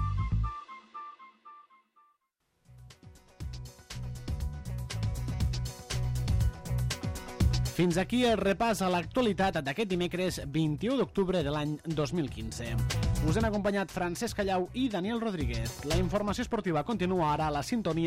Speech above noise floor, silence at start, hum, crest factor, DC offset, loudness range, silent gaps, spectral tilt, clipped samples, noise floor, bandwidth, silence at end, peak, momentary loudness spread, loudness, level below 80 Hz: 47 dB; 0 s; none; 16 dB; under 0.1%; 13 LU; none; -6 dB/octave; under 0.1%; -77 dBFS; 16 kHz; 0 s; -16 dBFS; 11 LU; -31 LUFS; -40 dBFS